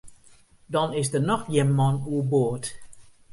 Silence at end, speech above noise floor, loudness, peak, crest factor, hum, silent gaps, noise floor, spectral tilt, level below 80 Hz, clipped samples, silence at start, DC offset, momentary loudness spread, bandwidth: 0.25 s; 30 dB; -25 LUFS; -8 dBFS; 18 dB; none; none; -54 dBFS; -6 dB/octave; -56 dBFS; under 0.1%; 0.05 s; under 0.1%; 7 LU; 11.5 kHz